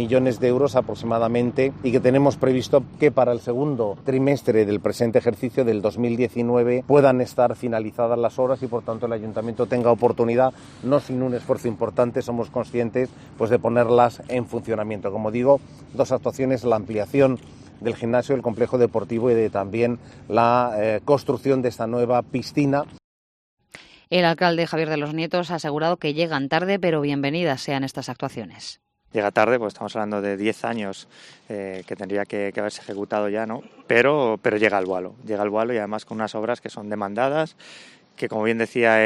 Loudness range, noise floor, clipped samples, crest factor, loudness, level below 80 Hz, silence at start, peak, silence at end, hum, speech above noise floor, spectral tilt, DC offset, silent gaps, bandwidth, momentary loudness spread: 5 LU; -48 dBFS; under 0.1%; 18 dB; -22 LUFS; -58 dBFS; 0 s; -4 dBFS; 0 s; none; 26 dB; -6.5 dB/octave; under 0.1%; 23.04-23.57 s; 13 kHz; 11 LU